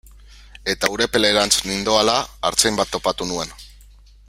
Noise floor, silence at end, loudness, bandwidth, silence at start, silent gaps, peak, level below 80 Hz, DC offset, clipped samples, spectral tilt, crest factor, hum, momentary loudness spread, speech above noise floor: -46 dBFS; 0.6 s; -19 LUFS; 16 kHz; 0.3 s; none; 0 dBFS; -44 dBFS; under 0.1%; under 0.1%; -2 dB/octave; 20 dB; none; 9 LU; 27 dB